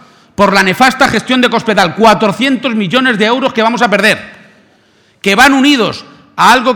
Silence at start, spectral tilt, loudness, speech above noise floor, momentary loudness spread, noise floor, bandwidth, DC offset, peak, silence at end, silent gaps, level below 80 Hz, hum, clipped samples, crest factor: 0.4 s; -4 dB/octave; -9 LUFS; 40 dB; 8 LU; -49 dBFS; 19.5 kHz; under 0.1%; 0 dBFS; 0 s; none; -44 dBFS; none; 0.6%; 10 dB